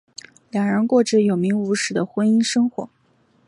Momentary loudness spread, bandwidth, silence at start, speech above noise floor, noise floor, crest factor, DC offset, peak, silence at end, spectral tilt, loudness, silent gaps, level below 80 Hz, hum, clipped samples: 17 LU; 11 kHz; 0.55 s; 41 dB; -60 dBFS; 16 dB; under 0.1%; -6 dBFS; 0.6 s; -5 dB/octave; -20 LUFS; none; -66 dBFS; none; under 0.1%